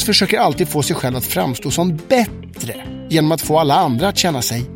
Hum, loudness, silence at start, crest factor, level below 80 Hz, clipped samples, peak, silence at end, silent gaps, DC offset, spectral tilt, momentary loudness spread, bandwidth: none; -16 LUFS; 0 s; 16 dB; -42 dBFS; under 0.1%; 0 dBFS; 0 s; none; under 0.1%; -4.5 dB/octave; 12 LU; 17 kHz